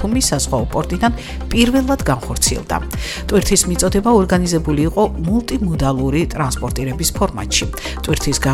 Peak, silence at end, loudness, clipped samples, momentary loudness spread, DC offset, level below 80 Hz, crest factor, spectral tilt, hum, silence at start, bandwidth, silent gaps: 0 dBFS; 0 s; -17 LUFS; under 0.1%; 8 LU; under 0.1%; -26 dBFS; 16 dB; -4.5 dB/octave; none; 0 s; 17 kHz; none